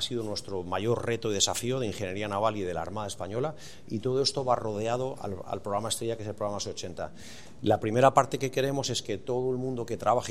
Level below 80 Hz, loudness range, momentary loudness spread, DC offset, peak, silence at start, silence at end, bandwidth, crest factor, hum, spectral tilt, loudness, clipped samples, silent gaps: -62 dBFS; 4 LU; 10 LU; 0.6%; -4 dBFS; 0 s; 0 s; 16 kHz; 24 dB; none; -4.5 dB/octave; -30 LUFS; under 0.1%; none